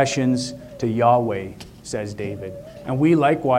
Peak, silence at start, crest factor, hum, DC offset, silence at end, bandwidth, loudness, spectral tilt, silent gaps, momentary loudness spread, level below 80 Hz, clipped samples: -4 dBFS; 0 s; 18 dB; none; under 0.1%; 0 s; 15 kHz; -21 LUFS; -6 dB/octave; none; 18 LU; -52 dBFS; under 0.1%